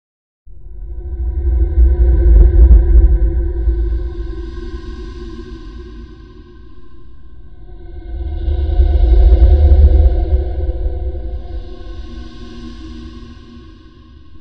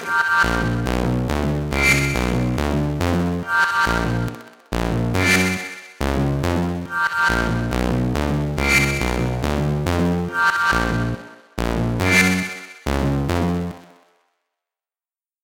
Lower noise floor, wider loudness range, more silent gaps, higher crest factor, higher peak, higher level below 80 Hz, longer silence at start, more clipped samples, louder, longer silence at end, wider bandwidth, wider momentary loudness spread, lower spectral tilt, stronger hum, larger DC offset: second, -39 dBFS vs under -90 dBFS; first, 19 LU vs 2 LU; neither; about the same, 14 dB vs 18 dB; about the same, 0 dBFS vs -2 dBFS; first, -14 dBFS vs -30 dBFS; first, 0.65 s vs 0 s; first, 0.5% vs under 0.1%; first, -14 LUFS vs -20 LUFS; second, 0.2 s vs 1.6 s; second, 4.4 kHz vs 17 kHz; first, 23 LU vs 10 LU; first, -10 dB/octave vs -5 dB/octave; neither; first, 2% vs under 0.1%